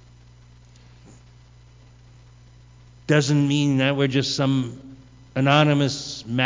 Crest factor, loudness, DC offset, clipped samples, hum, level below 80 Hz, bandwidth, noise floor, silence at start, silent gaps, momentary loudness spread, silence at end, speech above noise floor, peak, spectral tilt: 20 dB; -21 LUFS; under 0.1%; under 0.1%; 60 Hz at -50 dBFS; -54 dBFS; 7.6 kHz; -49 dBFS; 3.1 s; none; 14 LU; 0 s; 29 dB; -4 dBFS; -5.5 dB/octave